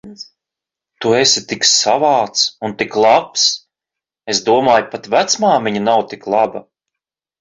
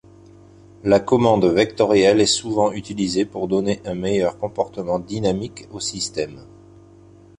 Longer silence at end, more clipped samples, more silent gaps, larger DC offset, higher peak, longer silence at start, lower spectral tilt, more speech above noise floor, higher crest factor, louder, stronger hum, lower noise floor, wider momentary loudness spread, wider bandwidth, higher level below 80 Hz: second, 0.8 s vs 0.95 s; neither; neither; neither; about the same, 0 dBFS vs -2 dBFS; second, 0.05 s vs 0.85 s; second, -2 dB/octave vs -4.5 dB/octave; first, 71 dB vs 28 dB; about the same, 16 dB vs 18 dB; first, -14 LUFS vs -20 LUFS; neither; first, -85 dBFS vs -47 dBFS; about the same, 10 LU vs 12 LU; second, 8 kHz vs 11 kHz; second, -58 dBFS vs -50 dBFS